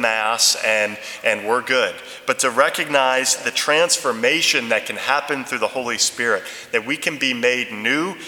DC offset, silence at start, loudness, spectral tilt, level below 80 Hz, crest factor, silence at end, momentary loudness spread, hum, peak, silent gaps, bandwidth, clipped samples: under 0.1%; 0 s; -18 LUFS; -1 dB/octave; -70 dBFS; 20 dB; 0 s; 7 LU; none; 0 dBFS; none; 19.5 kHz; under 0.1%